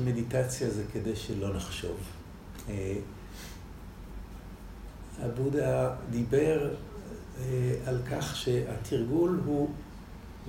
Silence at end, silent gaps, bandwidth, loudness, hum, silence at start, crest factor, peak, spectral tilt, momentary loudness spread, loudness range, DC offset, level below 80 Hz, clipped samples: 0 s; none; 16 kHz; -31 LUFS; none; 0 s; 18 dB; -14 dBFS; -6.5 dB/octave; 19 LU; 10 LU; under 0.1%; -48 dBFS; under 0.1%